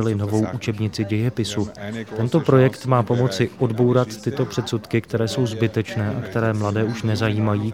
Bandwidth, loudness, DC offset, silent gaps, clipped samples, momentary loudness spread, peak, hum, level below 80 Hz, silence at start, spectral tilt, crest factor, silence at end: 15.5 kHz; -22 LUFS; 0.1%; none; under 0.1%; 7 LU; -2 dBFS; none; -54 dBFS; 0 s; -7 dB/octave; 18 dB; 0 s